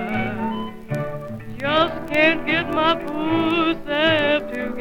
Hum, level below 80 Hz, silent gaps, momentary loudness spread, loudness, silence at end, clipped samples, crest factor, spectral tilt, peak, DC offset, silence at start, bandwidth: none; -44 dBFS; none; 11 LU; -21 LUFS; 0 s; under 0.1%; 18 dB; -6 dB/octave; -4 dBFS; under 0.1%; 0 s; 16.5 kHz